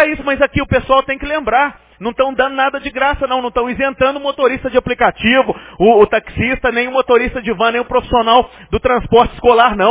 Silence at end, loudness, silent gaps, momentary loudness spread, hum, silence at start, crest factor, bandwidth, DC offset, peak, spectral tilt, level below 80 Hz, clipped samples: 0 s; -14 LUFS; none; 7 LU; none; 0 s; 14 dB; 4 kHz; under 0.1%; 0 dBFS; -9 dB/octave; -34 dBFS; under 0.1%